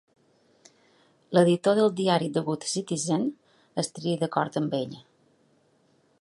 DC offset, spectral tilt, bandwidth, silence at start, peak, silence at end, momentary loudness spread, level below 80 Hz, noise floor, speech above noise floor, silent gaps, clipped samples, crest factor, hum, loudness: under 0.1%; -5.5 dB/octave; 11.5 kHz; 1.3 s; -6 dBFS; 1.25 s; 10 LU; -74 dBFS; -65 dBFS; 40 dB; none; under 0.1%; 22 dB; none; -26 LUFS